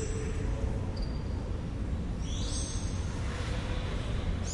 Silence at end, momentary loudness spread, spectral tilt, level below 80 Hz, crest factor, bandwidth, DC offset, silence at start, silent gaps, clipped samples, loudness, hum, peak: 0 s; 2 LU; -5.5 dB/octave; -36 dBFS; 12 dB; 11.5 kHz; under 0.1%; 0 s; none; under 0.1%; -35 LUFS; none; -20 dBFS